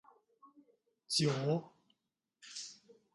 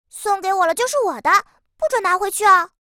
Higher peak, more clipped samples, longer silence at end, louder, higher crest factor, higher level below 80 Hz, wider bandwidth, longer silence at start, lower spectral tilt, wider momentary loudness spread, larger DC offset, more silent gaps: second, -18 dBFS vs -2 dBFS; neither; first, 0.4 s vs 0.15 s; second, -36 LUFS vs -18 LUFS; first, 22 dB vs 16 dB; second, -80 dBFS vs -60 dBFS; second, 11.5 kHz vs 19 kHz; first, 0.45 s vs 0.15 s; first, -4.5 dB/octave vs -0.5 dB/octave; first, 17 LU vs 8 LU; neither; neither